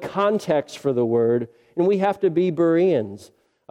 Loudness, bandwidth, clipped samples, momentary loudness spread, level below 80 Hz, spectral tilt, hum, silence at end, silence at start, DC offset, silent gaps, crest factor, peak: -21 LUFS; 12 kHz; under 0.1%; 6 LU; -66 dBFS; -7.5 dB/octave; none; 0.45 s; 0 s; under 0.1%; none; 14 dB; -8 dBFS